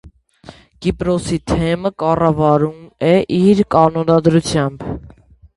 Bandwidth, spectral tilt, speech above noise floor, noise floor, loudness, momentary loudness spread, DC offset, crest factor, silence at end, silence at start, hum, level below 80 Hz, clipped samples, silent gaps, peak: 11.5 kHz; -7 dB/octave; 30 dB; -44 dBFS; -15 LUFS; 9 LU; under 0.1%; 16 dB; 0.5 s; 0.05 s; none; -38 dBFS; under 0.1%; none; 0 dBFS